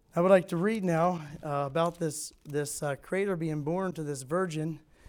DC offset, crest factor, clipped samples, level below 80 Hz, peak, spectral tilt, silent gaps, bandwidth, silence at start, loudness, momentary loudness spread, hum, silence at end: under 0.1%; 20 dB; under 0.1%; -62 dBFS; -10 dBFS; -6 dB/octave; none; 20 kHz; 0.15 s; -30 LUFS; 12 LU; none; 0.3 s